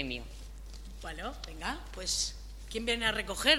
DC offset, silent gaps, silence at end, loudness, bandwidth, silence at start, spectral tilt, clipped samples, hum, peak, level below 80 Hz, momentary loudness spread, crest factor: under 0.1%; none; 0 s; -34 LUFS; 16.5 kHz; 0 s; -2 dB/octave; under 0.1%; none; -8 dBFS; -44 dBFS; 18 LU; 26 dB